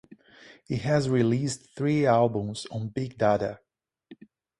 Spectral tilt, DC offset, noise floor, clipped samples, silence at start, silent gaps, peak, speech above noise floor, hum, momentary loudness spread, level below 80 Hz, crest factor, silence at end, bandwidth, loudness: -6.5 dB/octave; under 0.1%; -54 dBFS; under 0.1%; 0.45 s; none; -8 dBFS; 28 dB; none; 11 LU; -60 dBFS; 20 dB; 0.45 s; 11.5 kHz; -26 LUFS